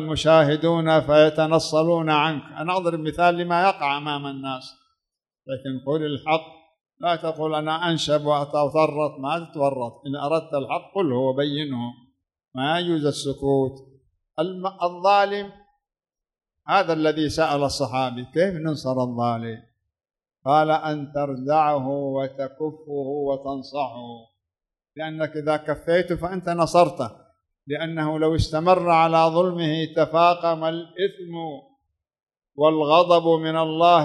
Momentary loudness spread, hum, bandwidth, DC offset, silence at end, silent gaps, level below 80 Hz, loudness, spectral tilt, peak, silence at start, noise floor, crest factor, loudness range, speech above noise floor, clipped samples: 13 LU; none; 12 kHz; under 0.1%; 0 s; none; -50 dBFS; -22 LUFS; -6 dB/octave; -2 dBFS; 0 s; under -90 dBFS; 20 dB; 7 LU; over 68 dB; under 0.1%